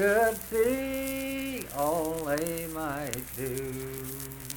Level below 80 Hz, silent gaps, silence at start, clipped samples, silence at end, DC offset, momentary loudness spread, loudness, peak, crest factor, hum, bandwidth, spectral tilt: -52 dBFS; none; 0 s; under 0.1%; 0 s; under 0.1%; 9 LU; -31 LUFS; -8 dBFS; 22 dB; none; 19 kHz; -4.5 dB/octave